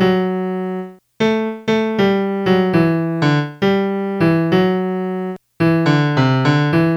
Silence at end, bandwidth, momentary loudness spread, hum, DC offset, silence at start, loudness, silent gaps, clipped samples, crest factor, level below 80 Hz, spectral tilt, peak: 0 s; 12 kHz; 8 LU; none; under 0.1%; 0 s; -17 LUFS; none; under 0.1%; 16 dB; -52 dBFS; -7.5 dB/octave; 0 dBFS